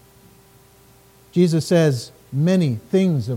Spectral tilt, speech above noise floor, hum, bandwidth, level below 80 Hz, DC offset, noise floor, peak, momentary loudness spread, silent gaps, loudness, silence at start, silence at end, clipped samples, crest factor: -7 dB/octave; 33 dB; none; 16 kHz; -60 dBFS; under 0.1%; -51 dBFS; -6 dBFS; 9 LU; none; -19 LUFS; 1.35 s; 0 s; under 0.1%; 14 dB